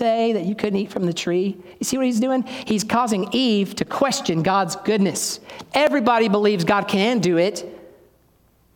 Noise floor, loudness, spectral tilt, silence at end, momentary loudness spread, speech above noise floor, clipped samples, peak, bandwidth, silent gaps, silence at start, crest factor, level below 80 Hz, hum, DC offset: -58 dBFS; -20 LUFS; -4.5 dB/octave; 0.9 s; 7 LU; 38 dB; under 0.1%; -4 dBFS; 18 kHz; none; 0 s; 16 dB; -60 dBFS; none; under 0.1%